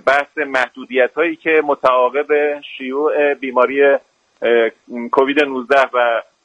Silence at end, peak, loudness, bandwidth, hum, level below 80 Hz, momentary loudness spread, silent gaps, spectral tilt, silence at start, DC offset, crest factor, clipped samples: 0.2 s; 0 dBFS; -16 LUFS; 9 kHz; none; -64 dBFS; 6 LU; none; -4.5 dB/octave; 0.05 s; under 0.1%; 16 dB; under 0.1%